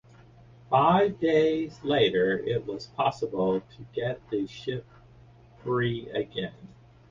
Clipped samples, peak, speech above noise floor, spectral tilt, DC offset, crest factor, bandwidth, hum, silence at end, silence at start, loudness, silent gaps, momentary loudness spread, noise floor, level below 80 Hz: under 0.1%; -8 dBFS; 27 dB; -7 dB/octave; under 0.1%; 18 dB; 7.4 kHz; none; 0.45 s; 0.7 s; -27 LUFS; none; 13 LU; -53 dBFS; -58 dBFS